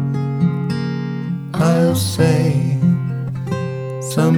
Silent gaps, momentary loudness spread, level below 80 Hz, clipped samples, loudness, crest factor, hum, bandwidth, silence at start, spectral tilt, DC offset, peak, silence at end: none; 9 LU; -52 dBFS; under 0.1%; -18 LUFS; 16 dB; none; 16.5 kHz; 0 s; -7 dB/octave; under 0.1%; -2 dBFS; 0 s